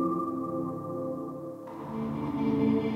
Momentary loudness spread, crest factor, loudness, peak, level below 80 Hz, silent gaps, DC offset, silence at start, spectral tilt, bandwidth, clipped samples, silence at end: 13 LU; 16 dB; -32 LUFS; -14 dBFS; -60 dBFS; none; under 0.1%; 0 s; -9 dB/octave; 14 kHz; under 0.1%; 0 s